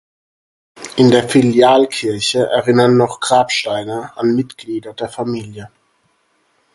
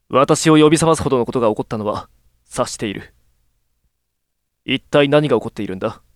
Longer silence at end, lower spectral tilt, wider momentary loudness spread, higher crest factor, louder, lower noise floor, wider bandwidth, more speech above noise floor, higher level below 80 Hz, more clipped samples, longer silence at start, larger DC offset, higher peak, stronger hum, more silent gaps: first, 1.1 s vs 0.2 s; about the same, -5 dB/octave vs -5 dB/octave; about the same, 15 LU vs 15 LU; about the same, 16 dB vs 18 dB; first, -14 LUFS vs -17 LUFS; second, -61 dBFS vs -74 dBFS; second, 11.5 kHz vs 14 kHz; second, 47 dB vs 58 dB; second, -54 dBFS vs -48 dBFS; neither; first, 0.75 s vs 0.1 s; neither; about the same, 0 dBFS vs 0 dBFS; neither; neither